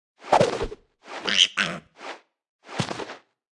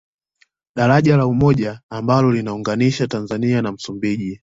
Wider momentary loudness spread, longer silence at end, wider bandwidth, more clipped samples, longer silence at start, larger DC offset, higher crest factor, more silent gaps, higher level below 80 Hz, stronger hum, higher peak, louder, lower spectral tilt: first, 21 LU vs 10 LU; first, 0.35 s vs 0.05 s; first, 12 kHz vs 7.8 kHz; neither; second, 0.2 s vs 0.75 s; neither; first, 24 dB vs 16 dB; about the same, 2.49-2.59 s vs 1.83-1.89 s; about the same, -50 dBFS vs -46 dBFS; neither; about the same, -4 dBFS vs -2 dBFS; second, -23 LUFS vs -18 LUFS; second, -2.5 dB/octave vs -7.5 dB/octave